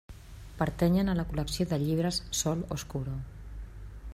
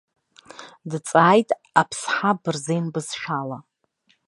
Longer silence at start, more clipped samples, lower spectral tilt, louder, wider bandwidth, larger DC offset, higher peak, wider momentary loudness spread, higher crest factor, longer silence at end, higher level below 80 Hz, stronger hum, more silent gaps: second, 0.1 s vs 0.6 s; neither; about the same, -5.5 dB/octave vs -5 dB/octave; second, -31 LUFS vs -22 LUFS; first, 15.5 kHz vs 11.5 kHz; neither; second, -14 dBFS vs -2 dBFS; about the same, 20 LU vs 21 LU; about the same, 18 dB vs 22 dB; second, 0 s vs 0.7 s; first, -44 dBFS vs -70 dBFS; neither; neither